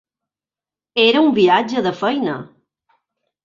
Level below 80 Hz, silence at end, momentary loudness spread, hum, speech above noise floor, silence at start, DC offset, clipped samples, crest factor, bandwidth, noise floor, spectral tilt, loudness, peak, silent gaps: -64 dBFS; 1 s; 11 LU; none; over 75 dB; 0.95 s; under 0.1%; under 0.1%; 18 dB; 7.4 kHz; under -90 dBFS; -5.5 dB/octave; -16 LUFS; -2 dBFS; none